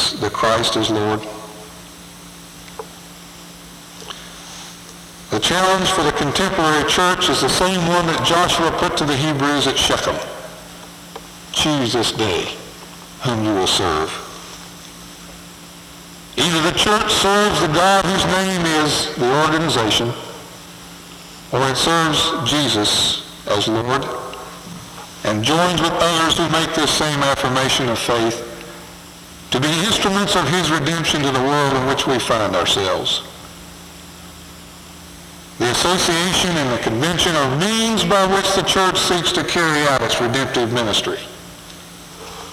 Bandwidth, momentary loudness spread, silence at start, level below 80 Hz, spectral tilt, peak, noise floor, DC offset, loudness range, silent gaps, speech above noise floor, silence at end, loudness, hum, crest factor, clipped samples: 18.5 kHz; 22 LU; 0 s; -44 dBFS; -3.5 dB/octave; -2 dBFS; -38 dBFS; under 0.1%; 7 LU; none; 21 dB; 0 s; -17 LUFS; none; 16 dB; under 0.1%